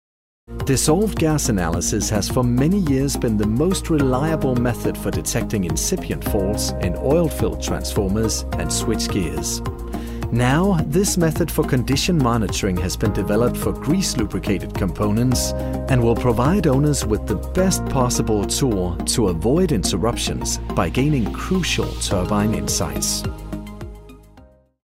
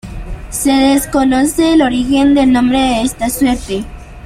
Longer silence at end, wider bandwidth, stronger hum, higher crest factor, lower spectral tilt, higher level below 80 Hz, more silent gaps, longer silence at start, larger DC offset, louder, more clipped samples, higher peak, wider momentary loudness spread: first, 0.4 s vs 0 s; about the same, 16 kHz vs 16 kHz; neither; about the same, 16 dB vs 12 dB; about the same, -5 dB/octave vs -4 dB/octave; about the same, -30 dBFS vs -30 dBFS; neither; first, 0.5 s vs 0.05 s; neither; second, -20 LUFS vs -12 LUFS; neither; about the same, -4 dBFS vs -2 dBFS; second, 6 LU vs 12 LU